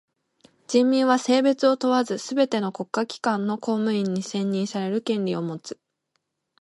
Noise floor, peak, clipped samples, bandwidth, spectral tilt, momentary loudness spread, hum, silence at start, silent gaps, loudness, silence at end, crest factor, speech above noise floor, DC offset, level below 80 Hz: -76 dBFS; -6 dBFS; under 0.1%; 11.5 kHz; -5.5 dB/octave; 8 LU; none; 0.7 s; none; -23 LUFS; 0.9 s; 18 dB; 53 dB; under 0.1%; -74 dBFS